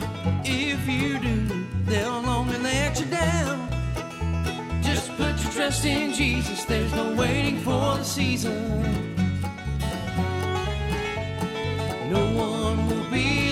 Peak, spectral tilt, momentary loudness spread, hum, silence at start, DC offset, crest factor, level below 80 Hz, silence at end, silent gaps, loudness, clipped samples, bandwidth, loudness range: -10 dBFS; -5 dB/octave; 5 LU; none; 0 s; under 0.1%; 14 dB; -36 dBFS; 0 s; none; -25 LUFS; under 0.1%; 16 kHz; 3 LU